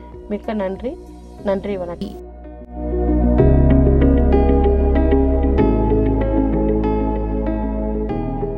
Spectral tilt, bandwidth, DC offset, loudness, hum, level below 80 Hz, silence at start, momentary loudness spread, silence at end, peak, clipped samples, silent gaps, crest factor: -11 dB/octave; 4.7 kHz; under 0.1%; -18 LUFS; none; -20 dBFS; 0 s; 15 LU; 0 s; -2 dBFS; under 0.1%; none; 16 dB